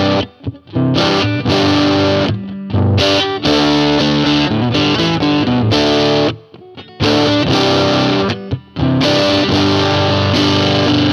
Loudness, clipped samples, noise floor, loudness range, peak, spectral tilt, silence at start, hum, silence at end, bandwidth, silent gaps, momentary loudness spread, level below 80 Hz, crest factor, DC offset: -13 LUFS; under 0.1%; -36 dBFS; 1 LU; 0 dBFS; -5.5 dB/octave; 0 s; none; 0 s; 12 kHz; none; 7 LU; -38 dBFS; 14 dB; under 0.1%